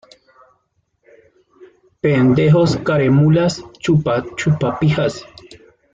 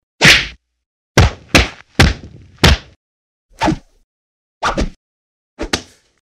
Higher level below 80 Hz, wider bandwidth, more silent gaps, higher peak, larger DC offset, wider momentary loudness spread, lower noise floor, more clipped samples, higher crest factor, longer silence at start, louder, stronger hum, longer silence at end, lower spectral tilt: second, -48 dBFS vs -24 dBFS; second, 7.8 kHz vs 16 kHz; second, none vs 0.86-1.15 s, 2.96-3.49 s, 4.04-4.61 s, 4.96-5.57 s; second, -4 dBFS vs 0 dBFS; neither; second, 9 LU vs 18 LU; first, -66 dBFS vs -36 dBFS; neither; about the same, 14 dB vs 16 dB; first, 1.6 s vs 0.2 s; about the same, -16 LUFS vs -14 LUFS; neither; about the same, 0.4 s vs 0.4 s; first, -7.5 dB/octave vs -3.5 dB/octave